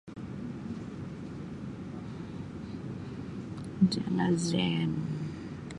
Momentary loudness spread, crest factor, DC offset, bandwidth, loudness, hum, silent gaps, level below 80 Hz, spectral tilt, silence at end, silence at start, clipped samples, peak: 13 LU; 20 dB; under 0.1%; 11.5 kHz; -34 LUFS; none; none; -56 dBFS; -6 dB/octave; 0 s; 0.05 s; under 0.1%; -14 dBFS